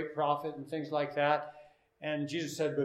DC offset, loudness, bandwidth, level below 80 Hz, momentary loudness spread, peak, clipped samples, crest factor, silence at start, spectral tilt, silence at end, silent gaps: under 0.1%; -34 LUFS; 15 kHz; -80 dBFS; 9 LU; -14 dBFS; under 0.1%; 20 dB; 0 s; -5 dB/octave; 0 s; none